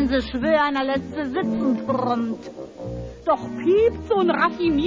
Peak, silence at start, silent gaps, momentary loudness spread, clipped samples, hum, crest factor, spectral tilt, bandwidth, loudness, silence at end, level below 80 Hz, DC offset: -6 dBFS; 0 s; none; 14 LU; under 0.1%; none; 14 dB; -7 dB/octave; 7.6 kHz; -22 LUFS; 0 s; -42 dBFS; under 0.1%